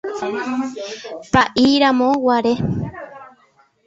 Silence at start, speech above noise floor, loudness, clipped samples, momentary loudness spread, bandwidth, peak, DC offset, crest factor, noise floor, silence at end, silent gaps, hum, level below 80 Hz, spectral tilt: 0.05 s; 39 dB; -17 LUFS; under 0.1%; 16 LU; 8 kHz; -2 dBFS; under 0.1%; 16 dB; -56 dBFS; 0.6 s; none; none; -46 dBFS; -5.5 dB/octave